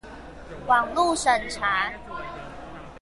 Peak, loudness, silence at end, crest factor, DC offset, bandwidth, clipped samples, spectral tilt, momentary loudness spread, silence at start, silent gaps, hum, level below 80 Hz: -8 dBFS; -23 LUFS; 0.05 s; 20 dB; under 0.1%; 11.5 kHz; under 0.1%; -2.5 dB/octave; 20 LU; 0.05 s; none; none; -48 dBFS